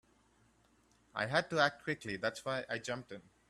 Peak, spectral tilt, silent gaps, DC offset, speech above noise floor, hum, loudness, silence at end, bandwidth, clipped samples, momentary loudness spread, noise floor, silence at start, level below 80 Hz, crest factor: -16 dBFS; -4 dB/octave; none; under 0.1%; 34 dB; none; -36 LUFS; 0.3 s; 13.5 kHz; under 0.1%; 11 LU; -70 dBFS; 1.15 s; -72 dBFS; 24 dB